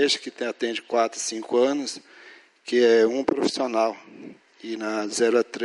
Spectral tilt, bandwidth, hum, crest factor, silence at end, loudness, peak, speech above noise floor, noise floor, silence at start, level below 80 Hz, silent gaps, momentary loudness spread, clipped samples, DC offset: -2.5 dB/octave; 11.5 kHz; none; 18 dB; 0 s; -24 LUFS; -8 dBFS; 26 dB; -50 dBFS; 0 s; -70 dBFS; none; 20 LU; under 0.1%; under 0.1%